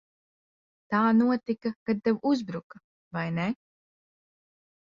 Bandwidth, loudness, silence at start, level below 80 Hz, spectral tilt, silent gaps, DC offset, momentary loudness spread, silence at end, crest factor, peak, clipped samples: 7.2 kHz; -27 LUFS; 0.9 s; -70 dBFS; -7.5 dB/octave; 1.76-1.86 s, 2.64-2.70 s, 2.84-3.11 s; under 0.1%; 15 LU; 1.4 s; 18 dB; -12 dBFS; under 0.1%